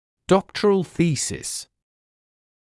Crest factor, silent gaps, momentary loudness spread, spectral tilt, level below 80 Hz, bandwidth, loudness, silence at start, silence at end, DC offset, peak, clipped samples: 20 dB; none; 9 LU; -5 dB/octave; -54 dBFS; 12 kHz; -22 LUFS; 0.3 s; 1.05 s; under 0.1%; -4 dBFS; under 0.1%